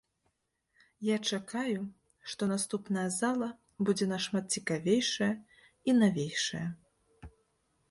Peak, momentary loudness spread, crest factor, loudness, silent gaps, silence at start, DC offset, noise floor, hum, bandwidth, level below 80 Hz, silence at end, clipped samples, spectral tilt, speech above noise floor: -14 dBFS; 12 LU; 18 dB; -32 LUFS; none; 1 s; under 0.1%; -79 dBFS; none; 11.5 kHz; -66 dBFS; 0.6 s; under 0.1%; -4.5 dB/octave; 48 dB